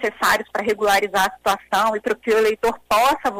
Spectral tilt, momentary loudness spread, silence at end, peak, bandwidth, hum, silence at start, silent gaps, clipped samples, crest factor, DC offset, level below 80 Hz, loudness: -2.5 dB/octave; 6 LU; 0 s; -6 dBFS; 16 kHz; none; 0 s; none; under 0.1%; 12 dB; under 0.1%; -50 dBFS; -19 LUFS